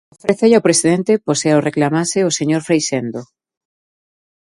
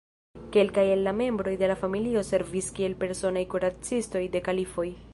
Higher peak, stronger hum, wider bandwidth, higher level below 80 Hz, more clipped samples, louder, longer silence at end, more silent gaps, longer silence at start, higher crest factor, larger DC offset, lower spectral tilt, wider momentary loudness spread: first, 0 dBFS vs -10 dBFS; neither; about the same, 11.5 kHz vs 11.5 kHz; second, -60 dBFS vs -52 dBFS; neither; first, -15 LUFS vs -27 LUFS; first, 1.2 s vs 0 s; neither; about the same, 0.25 s vs 0.35 s; about the same, 16 dB vs 18 dB; neither; about the same, -4.5 dB/octave vs -5 dB/octave; about the same, 8 LU vs 6 LU